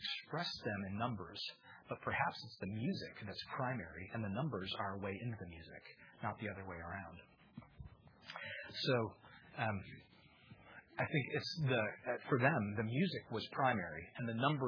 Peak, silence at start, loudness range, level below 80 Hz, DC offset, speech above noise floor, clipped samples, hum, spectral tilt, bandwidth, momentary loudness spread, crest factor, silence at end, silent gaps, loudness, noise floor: -18 dBFS; 0 s; 9 LU; -70 dBFS; under 0.1%; 22 dB; under 0.1%; none; -4 dB/octave; 5.4 kHz; 22 LU; 24 dB; 0 s; none; -41 LUFS; -63 dBFS